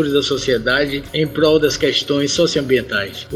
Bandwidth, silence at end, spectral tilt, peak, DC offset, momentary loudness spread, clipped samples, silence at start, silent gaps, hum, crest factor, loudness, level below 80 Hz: 15 kHz; 0 s; -4 dB/octave; -2 dBFS; under 0.1%; 6 LU; under 0.1%; 0 s; none; none; 16 dB; -17 LUFS; -42 dBFS